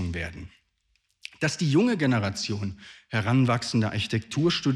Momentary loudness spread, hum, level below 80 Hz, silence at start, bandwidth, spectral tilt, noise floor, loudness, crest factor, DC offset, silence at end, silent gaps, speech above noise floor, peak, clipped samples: 15 LU; none; -56 dBFS; 0 s; 12 kHz; -5.5 dB/octave; -72 dBFS; -26 LUFS; 16 dB; under 0.1%; 0 s; none; 46 dB; -10 dBFS; under 0.1%